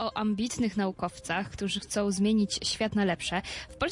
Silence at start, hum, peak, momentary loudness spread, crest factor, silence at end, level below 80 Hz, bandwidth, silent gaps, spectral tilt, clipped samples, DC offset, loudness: 0 s; none; -14 dBFS; 7 LU; 16 dB; 0 s; -54 dBFS; 11.5 kHz; none; -4.5 dB/octave; under 0.1%; under 0.1%; -30 LUFS